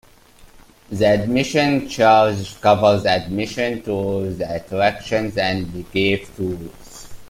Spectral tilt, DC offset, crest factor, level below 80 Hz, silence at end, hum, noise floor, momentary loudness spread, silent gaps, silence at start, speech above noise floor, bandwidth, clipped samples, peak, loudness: -5.5 dB/octave; under 0.1%; 18 dB; -46 dBFS; 0 s; none; -47 dBFS; 12 LU; none; 0.4 s; 29 dB; 16 kHz; under 0.1%; -2 dBFS; -19 LUFS